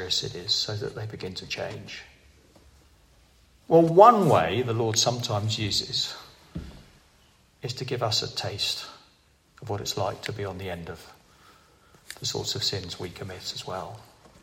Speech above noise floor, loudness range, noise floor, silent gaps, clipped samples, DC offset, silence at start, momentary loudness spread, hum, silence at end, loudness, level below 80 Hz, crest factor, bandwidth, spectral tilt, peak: 36 dB; 12 LU; -61 dBFS; none; under 0.1%; under 0.1%; 0 s; 20 LU; none; 0.4 s; -25 LUFS; -58 dBFS; 26 dB; 16 kHz; -4 dB/octave; -2 dBFS